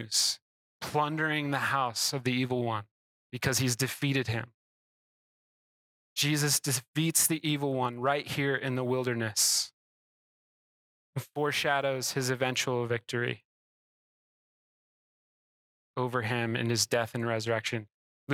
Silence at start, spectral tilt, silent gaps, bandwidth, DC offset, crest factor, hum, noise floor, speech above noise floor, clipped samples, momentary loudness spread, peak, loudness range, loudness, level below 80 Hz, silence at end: 0 s; -3.5 dB/octave; 0.42-0.80 s, 2.91-3.30 s, 4.54-6.16 s, 6.88-6.93 s, 9.73-11.13 s, 13.45-15.94 s, 17.94-18.27 s; 17.5 kHz; under 0.1%; 20 dB; none; under -90 dBFS; over 60 dB; under 0.1%; 11 LU; -12 dBFS; 7 LU; -29 LUFS; -68 dBFS; 0 s